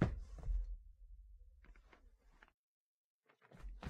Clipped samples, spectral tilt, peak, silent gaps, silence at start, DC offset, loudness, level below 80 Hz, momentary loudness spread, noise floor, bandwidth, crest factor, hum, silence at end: under 0.1%; -8.5 dB/octave; -20 dBFS; 2.54-3.22 s; 0 s; under 0.1%; -47 LUFS; -50 dBFS; 23 LU; -67 dBFS; 7.4 kHz; 26 dB; none; 0 s